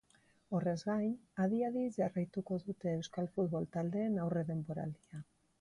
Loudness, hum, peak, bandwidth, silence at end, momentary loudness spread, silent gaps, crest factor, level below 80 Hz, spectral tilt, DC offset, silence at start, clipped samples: -38 LUFS; none; -24 dBFS; 11 kHz; 0.4 s; 7 LU; none; 14 dB; -72 dBFS; -8 dB/octave; under 0.1%; 0.5 s; under 0.1%